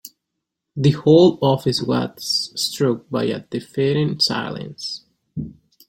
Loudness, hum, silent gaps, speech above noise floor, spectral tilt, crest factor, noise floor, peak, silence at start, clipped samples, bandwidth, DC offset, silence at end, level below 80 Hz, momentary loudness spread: -19 LUFS; none; none; 61 dB; -5.5 dB/octave; 18 dB; -80 dBFS; -2 dBFS; 0.05 s; under 0.1%; 16.5 kHz; under 0.1%; 0.35 s; -54 dBFS; 19 LU